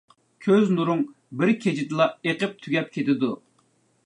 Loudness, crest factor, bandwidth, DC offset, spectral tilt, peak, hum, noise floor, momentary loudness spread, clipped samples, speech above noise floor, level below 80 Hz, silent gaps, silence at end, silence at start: -24 LUFS; 18 dB; 10.5 kHz; under 0.1%; -7 dB/octave; -8 dBFS; none; -65 dBFS; 8 LU; under 0.1%; 42 dB; -74 dBFS; none; 0.7 s; 0.4 s